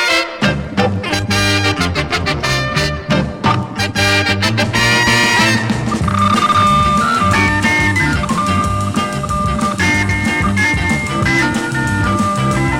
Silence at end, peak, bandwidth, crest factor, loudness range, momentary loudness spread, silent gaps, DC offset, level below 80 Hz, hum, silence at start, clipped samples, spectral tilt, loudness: 0 s; 0 dBFS; 16.5 kHz; 14 dB; 3 LU; 6 LU; none; under 0.1%; -30 dBFS; none; 0 s; under 0.1%; -4.5 dB/octave; -14 LUFS